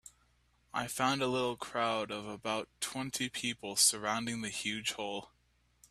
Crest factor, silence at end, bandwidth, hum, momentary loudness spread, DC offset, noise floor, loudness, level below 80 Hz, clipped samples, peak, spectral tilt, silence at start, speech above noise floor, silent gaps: 24 dB; 0.65 s; 15.5 kHz; none; 12 LU; under 0.1%; -71 dBFS; -34 LUFS; -70 dBFS; under 0.1%; -12 dBFS; -2 dB/octave; 0.05 s; 36 dB; none